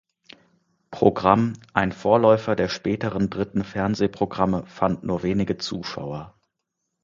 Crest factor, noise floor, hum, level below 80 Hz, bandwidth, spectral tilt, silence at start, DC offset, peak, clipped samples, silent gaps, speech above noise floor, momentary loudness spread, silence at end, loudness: 22 dB; -79 dBFS; none; -50 dBFS; 7.6 kHz; -7 dB/octave; 0.9 s; under 0.1%; 0 dBFS; under 0.1%; none; 57 dB; 12 LU; 0.75 s; -23 LUFS